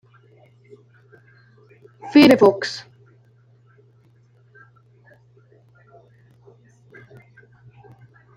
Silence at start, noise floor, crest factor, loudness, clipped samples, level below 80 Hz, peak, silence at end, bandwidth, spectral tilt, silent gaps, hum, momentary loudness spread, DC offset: 2.05 s; -55 dBFS; 24 dB; -15 LUFS; under 0.1%; -64 dBFS; 0 dBFS; 5.6 s; 15.5 kHz; -5.5 dB/octave; none; none; 23 LU; under 0.1%